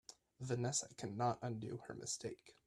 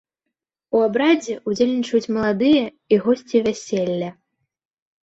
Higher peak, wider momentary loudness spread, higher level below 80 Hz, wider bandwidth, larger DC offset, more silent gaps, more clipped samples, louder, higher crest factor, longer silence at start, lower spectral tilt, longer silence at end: second, -26 dBFS vs -4 dBFS; first, 11 LU vs 7 LU; second, -76 dBFS vs -58 dBFS; first, 13 kHz vs 8 kHz; neither; neither; neither; second, -43 LUFS vs -20 LUFS; about the same, 18 dB vs 16 dB; second, 0.1 s vs 0.7 s; about the same, -4.5 dB/octave vs -5.5 dB/octave; second, 0.15 s vs 0.9 s